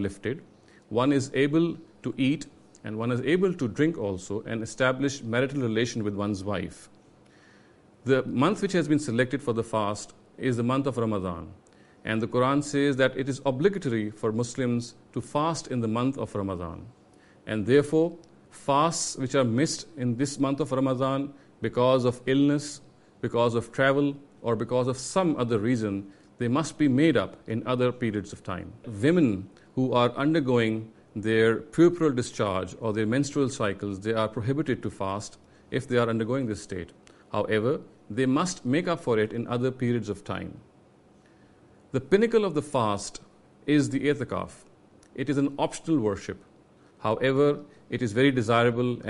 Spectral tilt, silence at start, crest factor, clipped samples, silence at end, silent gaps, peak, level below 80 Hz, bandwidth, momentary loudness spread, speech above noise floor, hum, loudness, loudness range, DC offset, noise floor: -6 dB/octave; 0 s; 20 dB; under 0.1%; 0 s; none; -8 dBFS; -60 dBFS; 11.5 kHz; 13 LU; 31 dB; none; -27 LUFS; 4 LU; under 0.1%; -57 dBFS